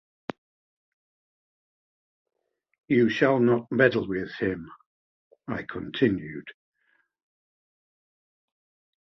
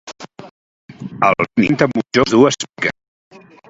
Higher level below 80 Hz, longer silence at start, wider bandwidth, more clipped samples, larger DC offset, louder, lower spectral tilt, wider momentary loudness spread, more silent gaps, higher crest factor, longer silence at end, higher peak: second, -62 dBFS vs -50 dBFS; first, 2.9 s vs 0.05 s; second, 6.4 kHz vs 8 kHz; neither; neither; second, -25 LUFS vs -15 LUFS; first, -7.5 dB/octave vs -5 dB/octave; second, 19 LU vs 22 LU; first, 4.86-5.31 s vs 0.51-0.89 s; first, 24 dB vs 18 dB; first, 2.65 s vs 0.8 s; second, -6 dBFS vs 0 dBFS